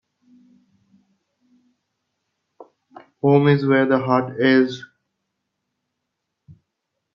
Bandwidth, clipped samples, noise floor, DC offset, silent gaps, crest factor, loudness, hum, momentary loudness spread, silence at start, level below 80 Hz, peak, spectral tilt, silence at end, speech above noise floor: 6.8 kHz; under 0.1%; -79 dBFS; under 0.1%; none; 20 dB; -18 LUFS; none; 8 LU; 2.6 s; -68 dBFS; -4 dBFS; -8 dB/octave; 2.3 s; 62 dB